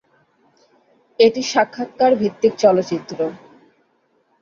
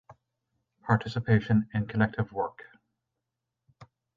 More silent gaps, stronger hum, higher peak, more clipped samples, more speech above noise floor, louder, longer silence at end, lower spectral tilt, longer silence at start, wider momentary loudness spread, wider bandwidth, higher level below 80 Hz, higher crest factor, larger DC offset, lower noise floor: neither; neither; first, -2 dBFS vs -8 dBFS; neither; second, 46 dB vs 58 dB; first, -18 LUFS vs -28 LUFS; first, 1.05 s vs 0.35 s; second, -4.5 dB/octave vs -9 dB/octave; first, 1.2 s vs 0.1 s; about the same, 11 LU vs 10 LU; about the same, 7.4 kHz vs 7.2 kHz; second, -64 dBFS vs -56 dBFS; about the same, 18 dB vs 22 dB; neither; second, -63 dBFS vs -85 dBFS